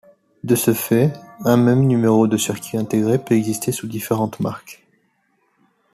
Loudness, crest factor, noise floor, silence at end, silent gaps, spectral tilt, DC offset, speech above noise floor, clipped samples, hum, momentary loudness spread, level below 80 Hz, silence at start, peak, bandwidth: -18 LUFS; 16 dB; -65 dBFS; 1.2 s; none; -6 dB/octave; under 0.1%; 47 dB; under 0.1%; none; 10 LU; -58 dBFS; 0.45 s; -2 dBFS; 14.5 kHz